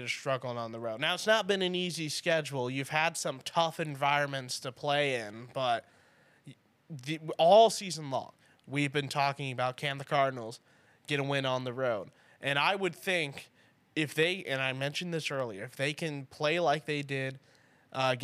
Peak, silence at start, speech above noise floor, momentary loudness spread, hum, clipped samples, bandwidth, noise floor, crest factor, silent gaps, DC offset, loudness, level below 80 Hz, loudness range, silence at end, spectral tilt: -12 dBFS; 0 s; 33 dB; 10 LU; none; under 0.1%; 15.5 kHz; -64 dBFS; 20 dB; none; under 0.1%; -31 LUFS; -84 dBFS; 4 LU; 0 s; -4 dB/octave